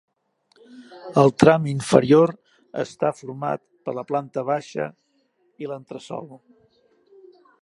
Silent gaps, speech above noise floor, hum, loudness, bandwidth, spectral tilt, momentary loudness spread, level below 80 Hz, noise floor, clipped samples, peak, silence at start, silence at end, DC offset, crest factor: none; 45 dB; none; -21 LUFS; 11.5 kHz; -6.5 dB/octave; 20 LU; -62 dBFS; -66 dBFS; under 0.1%; 0 dBFS; 0.75 s; 1.25 s; under 0.1%; 22 dB